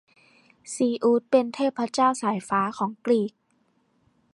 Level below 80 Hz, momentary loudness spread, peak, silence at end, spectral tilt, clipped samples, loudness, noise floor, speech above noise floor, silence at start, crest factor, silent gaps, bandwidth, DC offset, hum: -72 dBFS; 7 LU; -8 dBFS; 1.05 s; -5 dB/octave; under 0.1%; -24 LUFS; -68 dBFS; 44 dB; 0.65 s; 18 dB; none; 11.5 kHz; under 0.1%; none